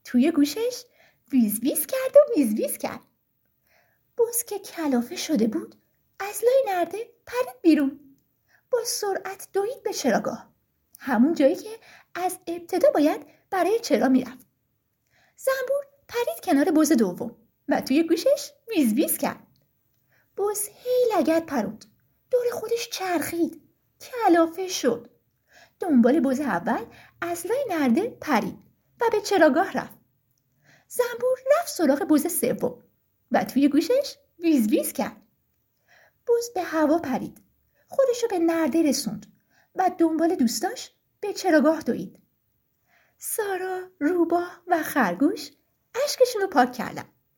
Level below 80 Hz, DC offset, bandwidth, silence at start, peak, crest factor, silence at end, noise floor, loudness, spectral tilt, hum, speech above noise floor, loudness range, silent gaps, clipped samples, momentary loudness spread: -68 dBFS; under 0.1%; 17 kHz; 0.05 s; -4 dBFS; 20 dB; 0.35 s; -73 dBFS; -24 LUFS; -4 dB/octave; none; 50 dB; 3 LU; none; under 0.1%; 14 LU